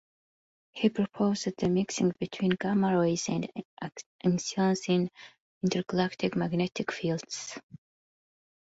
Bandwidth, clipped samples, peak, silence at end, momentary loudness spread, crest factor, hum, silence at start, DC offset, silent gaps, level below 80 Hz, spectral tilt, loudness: 8 kHz; under 0.1%; -10 dBFS; 0.95 s; 13 LU; 20 dB; none; 0.75 s; under 0.1%; 3.65-3.77 s, 4.06-4.19 s, 5.40-5.61 s, 7.63-7.69 s; -66 dBFS; -5.5 dB/octave; -30 LUFS